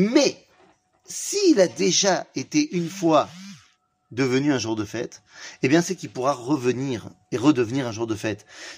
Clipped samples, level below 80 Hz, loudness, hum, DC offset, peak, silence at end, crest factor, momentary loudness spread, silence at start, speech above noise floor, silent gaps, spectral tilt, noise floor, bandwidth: under 0.1%; -66 dBFS; -23 LUFS; none; under 0.1%; -4 dBFS; 0 s; 18 dB; 15 LU; 0 s; 39 dB; none; -4.5 dB/octave; -62 dBFS; 15.5 kHz